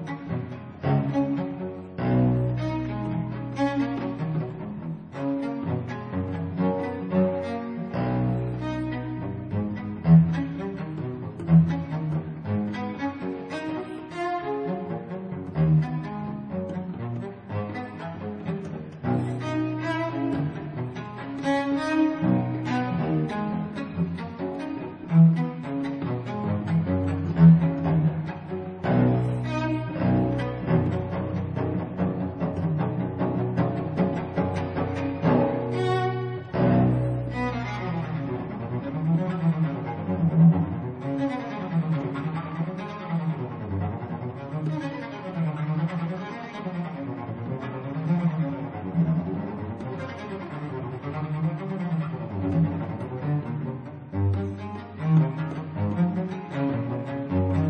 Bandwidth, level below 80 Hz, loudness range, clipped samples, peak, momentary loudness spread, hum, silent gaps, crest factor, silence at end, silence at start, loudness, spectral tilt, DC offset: 6.2 kHz; -50 dBFS; 7 LU; under 0.1%; -6 dBFS; 11 LU; none; none; 20 dB; 0 s; 0 s; -27 LUFS; -9.5 dB/octave; under 0.1%